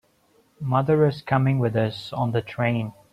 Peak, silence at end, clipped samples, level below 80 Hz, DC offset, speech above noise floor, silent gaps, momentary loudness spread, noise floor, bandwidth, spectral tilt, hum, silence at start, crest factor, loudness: -6 dBFS; 0.2 s; under 0.1%; -58 dBFS; under 0.1%; 39 dB; none; 7 LU; -62 dBFS; 9.2 kHz; -8.5 dB/octave; none; 0.6 s; 16 dB; -23 LUFS